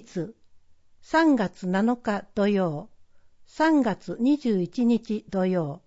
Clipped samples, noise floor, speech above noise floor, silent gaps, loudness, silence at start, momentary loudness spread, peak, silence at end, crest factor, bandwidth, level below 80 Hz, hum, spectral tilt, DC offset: under 0.1%; -53 dBFS; 29 dB; none; -25 LUFS; 0.15 s; 8 LU; -10 dBFS; 0.1 s; 16 dB; 8 kHz; -60 dBFS; none; -7 dB/octave; under 0.1%